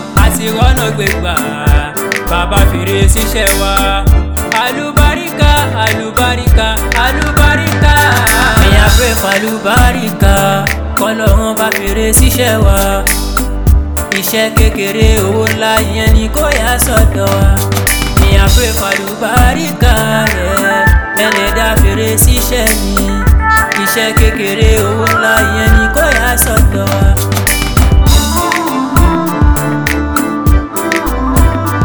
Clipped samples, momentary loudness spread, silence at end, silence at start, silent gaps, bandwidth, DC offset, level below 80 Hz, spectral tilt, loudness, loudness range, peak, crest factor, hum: 0.9%; 5 LU; 0 s; 0 s; none; over 20 kHz; 0.9%; -14 dBFS; -4.5 dB/octave; -10 LUFS; 2 LU; 0 dBFS; 10 dB; none